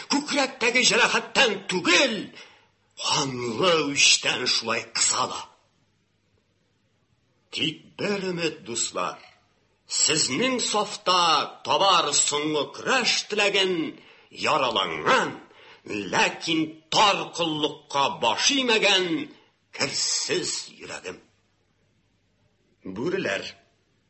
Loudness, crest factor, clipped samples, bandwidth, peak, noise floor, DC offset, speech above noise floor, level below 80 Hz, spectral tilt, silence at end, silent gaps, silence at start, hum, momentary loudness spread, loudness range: -22 LUFS; 20 dB; under 0.1%; 8.6 kHz; -6 dBFS; -69 dBFS; under 0.1%; 44 dB; -66 dBFS; -1.5 dB/octave; 0.6 s; none; 0 s; none; 13 LU; 9 LU